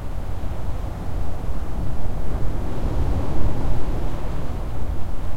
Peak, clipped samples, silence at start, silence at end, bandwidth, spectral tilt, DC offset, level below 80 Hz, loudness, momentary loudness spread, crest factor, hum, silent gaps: -4 dBFS; under 0.1%; 0 s; 0 s; 8 kHz; -7.5 dB/octave; under 0.1%; -26 dBFS; -29 LUFS; 5 LU; 12 dB; none; none